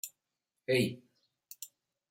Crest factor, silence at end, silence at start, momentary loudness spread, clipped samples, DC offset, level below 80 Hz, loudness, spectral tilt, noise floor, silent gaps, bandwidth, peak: 22 dB; 0.45 s; 0.05 s; 21 LU; under 0.1%; under 0.1%; -76 dBFS; -32 LUFS; -4.5 dB/octave; -88 dBFS; none; 16.5 kHz; -16 dBFS